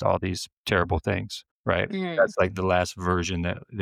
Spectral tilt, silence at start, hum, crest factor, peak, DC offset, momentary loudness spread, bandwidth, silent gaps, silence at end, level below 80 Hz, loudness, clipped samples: -5.5 dB/octave; 0 s; none; 18 dB; -8 dBFS; under 0.1%; 8 LU; 15.5 kHz; 0.52-0.64 s, 1.51-1.64 s; 0 s; -46 dBFS; -26 LUFS; under 0.1%